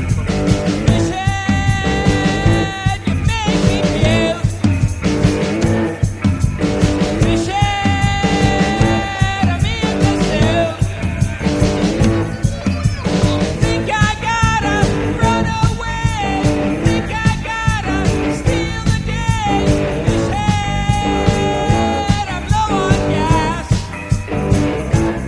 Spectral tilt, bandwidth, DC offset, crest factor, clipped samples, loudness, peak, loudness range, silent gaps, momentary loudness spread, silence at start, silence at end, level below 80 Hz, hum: -6 dB/octave; 11 kHz; under 0.1%; 16 dB; under 0.1%; -16 LUFS; 0 dBFS; 1 LU; none; 4 LU; 0 s; 0 s; -24 dBFS; none